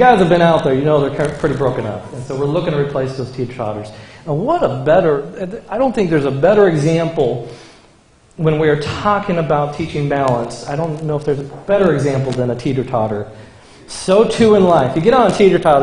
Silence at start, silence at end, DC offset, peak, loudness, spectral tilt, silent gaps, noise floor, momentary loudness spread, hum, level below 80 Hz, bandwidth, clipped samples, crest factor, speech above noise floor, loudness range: 0 s; 0 s; under 0.1%; 0 dBFS; -15 LUFS; -7 dB/octave; none; -49 dBFS; 13 LU; none; -44 dBFS; 10.5 kHz; under 0.1%; 14 dB; 34 dB; 4 LU